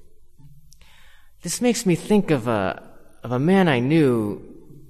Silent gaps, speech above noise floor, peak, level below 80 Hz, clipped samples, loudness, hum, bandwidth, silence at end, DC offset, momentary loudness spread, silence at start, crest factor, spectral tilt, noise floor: none; 26 dB; -4 dBFS; -52 dBFS; under 0.1%; -21 LUFS; none; 13 kHz; 0 s; under 0.1%; 17 LU; 0 s; 18 dB; -6 dB/octave; -46 dBFS